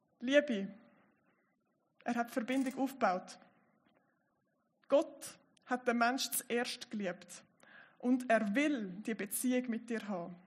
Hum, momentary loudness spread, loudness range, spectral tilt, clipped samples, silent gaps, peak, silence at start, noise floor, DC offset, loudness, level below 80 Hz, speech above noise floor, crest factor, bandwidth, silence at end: none; 14 LU; 4 LU; -4 dB/octave; under 0.1%; none; -16 dBFS; 0.2 s; -79 dBFS; under 0.1%; -35 LUFS; under -90 dBFS; 44 dB; 22 dB; 14 kHz; 0.1 s